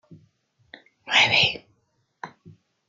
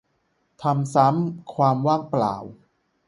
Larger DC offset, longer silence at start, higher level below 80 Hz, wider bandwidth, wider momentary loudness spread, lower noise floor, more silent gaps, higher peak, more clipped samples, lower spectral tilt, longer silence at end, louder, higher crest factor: neither; second, 0.1 s vs 0.6 s; about the same, -64 dBFS vs -64 dBFS; first, 13.5 kHz vs 11.5 kHz; first, 26 LU vs 10 LU; about the same, -70 dBFS vs -69 dBFS; neither; second, -6 dBFS vs -2 dBFS; neither; second, -1.5 dB/octave vs -8 dB/octave; about the same, 0.6 s vs 0.55 s; first, -18 LUFS vs -22 LUFS; about the same, 22 dB vs 20 dB